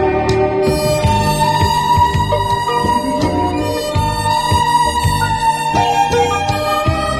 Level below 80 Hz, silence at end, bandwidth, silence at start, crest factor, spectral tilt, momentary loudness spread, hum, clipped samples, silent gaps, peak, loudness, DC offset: -28 dBFS; 0 s; 16 kHz; 0 s; 12 dB; -5 dB/octave; 3 LU; none; under 0.1%; none; -2 dBFS; -15 LUFS; under 0.1%